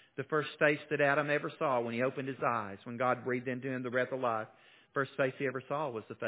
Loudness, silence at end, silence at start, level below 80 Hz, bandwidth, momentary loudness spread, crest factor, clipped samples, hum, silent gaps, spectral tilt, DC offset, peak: -34 LUFS; 0 s; 0.15 s; -80 dBFS; 4 kHz; 8 LU; 20 dB; under 0.1%; none; none; -4.5 dB/octave; under 0.1%; -12 dBFS